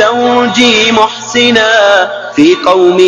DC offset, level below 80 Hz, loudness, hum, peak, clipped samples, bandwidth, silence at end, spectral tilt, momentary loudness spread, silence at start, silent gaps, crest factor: under 0.1%; -48 dBFS; -7 LUFS; none; 0 dBFS; 2%; 11 kHz; 0 s; -3 dB/octave; 4 LU; 0 s; none; 8 dB